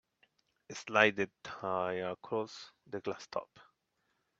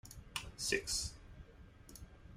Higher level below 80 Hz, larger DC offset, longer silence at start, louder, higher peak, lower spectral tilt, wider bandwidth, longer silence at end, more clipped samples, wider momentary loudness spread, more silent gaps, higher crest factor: second, -78 dBFS vs -56 dBFS; neither; first, 0.7 s vs 0.05 s; first, -35 LUFS vs -39 LUFS; first, -8 dBFS vs -20 dBFS; first, -4 dB/octave vs -1.5 dB/octave; second, 8 kHz vs 16 kHz; first, 0.75 s vs 0 s; neither; second, 18 LU vs 23 LU; neither; about the same, 28 dB vs 26 dB